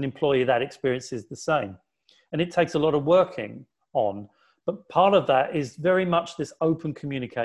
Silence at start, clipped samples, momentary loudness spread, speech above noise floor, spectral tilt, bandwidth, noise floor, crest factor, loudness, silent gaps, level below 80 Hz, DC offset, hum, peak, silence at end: 0 s; under 0.1%; 13 LU; 34 dB; -6 dB/octave; 11 kHz; -58 dBFS; 18 dB; -24 LUFS; none; -62 dBFS; under 0.1%; none; -6 dBFS; 0 s